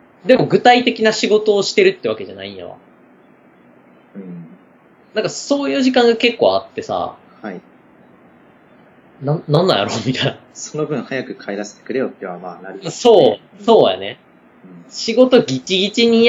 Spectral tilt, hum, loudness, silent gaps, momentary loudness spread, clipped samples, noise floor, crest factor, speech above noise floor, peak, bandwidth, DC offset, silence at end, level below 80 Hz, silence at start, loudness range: -4.5 dB/octave; none; -16 LUFS; none; 20 LU; under 0.1%; -49 dBFS; 18 dB; 33 dB; 0 dBFS; 8 kHz; under 0.1%; 0 s; -62 dBFS; 0.25 s; 8 LU